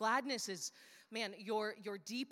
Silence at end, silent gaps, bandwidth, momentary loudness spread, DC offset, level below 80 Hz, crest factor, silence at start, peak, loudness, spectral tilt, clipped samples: 0.05 s; none; 16.5 kHz; 10 LU; under 0.1%; under -90 dBFS; 20 dB; 0 s; -22 dBFS; -41 LUFS; -2.5 dB/octave; under 0.1%